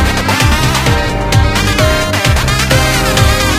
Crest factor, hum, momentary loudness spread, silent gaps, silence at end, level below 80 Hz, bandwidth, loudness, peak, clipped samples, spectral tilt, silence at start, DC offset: 10 dB; none; 2 LU; none; 0 s; -18 dBFS; 16.5 kHz; -11 LUFS; 0 dBFS; under 0.1%; -4 dB/octave; 0 s; under 0.1%